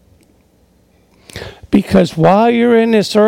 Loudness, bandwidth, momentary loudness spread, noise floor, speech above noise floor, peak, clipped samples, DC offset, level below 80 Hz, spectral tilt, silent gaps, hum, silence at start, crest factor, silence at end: -11 LUFS; 15.5 kHz; 20 LU; -52 dBFS; 42 dB; 0 dBFS; under 0.1%; under 0.1%; -44 dBFS; -6.5 dB/octave; none; none; 1.35 s; 14 dB; 0 s